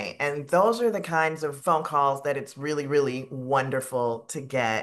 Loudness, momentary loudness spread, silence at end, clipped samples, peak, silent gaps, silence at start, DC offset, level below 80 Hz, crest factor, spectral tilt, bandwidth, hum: -26 LUFS; 8 LU; 0 s; under 0.1%; -8 dBFS; none; 0 s; under 0.1%; -74 dBFS; 18 dB; -5 dB/octave; 12.5 kHz; none